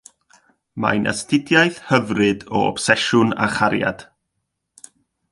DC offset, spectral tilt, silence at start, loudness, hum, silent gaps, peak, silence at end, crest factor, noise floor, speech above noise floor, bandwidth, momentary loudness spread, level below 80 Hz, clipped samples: under 0.1%; -4.5 dB/octave; 0.75 s; -18 LUFS; none; none; 0 dBFS; 1.3 s; 20 dB; -76 dBFS; 58 dB; 11.5 kHz; 7 LU; -54 dBFS; under 0.1%